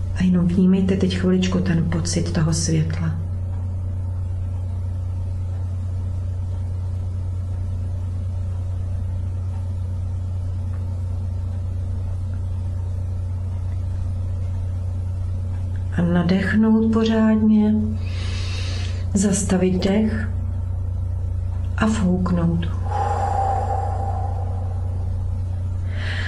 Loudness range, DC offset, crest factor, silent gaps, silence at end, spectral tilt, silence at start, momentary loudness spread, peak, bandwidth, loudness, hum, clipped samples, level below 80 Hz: 7 LU; under 0.1%; 16 dB; none; 0 s; -6.5 dB/octave; 0 s; 9 LU; -4 dBFS; 11.5 kHz; -23 LUFS; none; under 0.1%; -28 dBFS